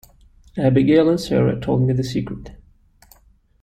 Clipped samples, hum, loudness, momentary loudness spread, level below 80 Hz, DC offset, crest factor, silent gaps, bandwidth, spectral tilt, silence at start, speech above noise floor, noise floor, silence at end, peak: under 0.1%; none; -18 LUFS; 16 LU; -44 dBFS; under 0.1%; 16 dB; none; 14.5 kHz; -8 dB/octave; 0.55 s; 37 dB; -55 dBFS; 1.05 s; -4 dBFS